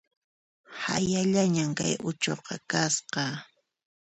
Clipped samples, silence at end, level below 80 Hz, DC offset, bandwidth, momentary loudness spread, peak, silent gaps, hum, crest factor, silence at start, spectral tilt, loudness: under 0.1%; 0.6 s; -64 dBFS; under 0.1%; 8.8 kHz; 11 LU; -12 dBFS; none; none; 18 dB; 0.7 s; -4 dB/octave; -28 LUFS